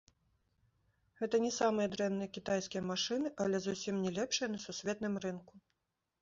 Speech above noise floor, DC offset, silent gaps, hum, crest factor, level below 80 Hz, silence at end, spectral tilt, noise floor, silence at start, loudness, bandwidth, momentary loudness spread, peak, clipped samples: 50 dB; under 0.1%; none; none; 18 dB; -72 dBFS; 0.65 s; -4 dB/octave; -86 dBFS; 1.2 s; -36 LUFS; 7.6 kHz; 7 LU; -20 dBFS; under 0.1%